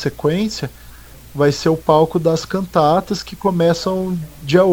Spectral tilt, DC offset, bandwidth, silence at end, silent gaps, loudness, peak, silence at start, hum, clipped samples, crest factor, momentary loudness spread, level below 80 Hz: -6 dB/octave; under 0.1%; over 20 kHz; 0 s; none; -17 LUFS; 0 dBFS; 0 s; none; under 0.1%; 16 dB; 11 LU; -42 dBFS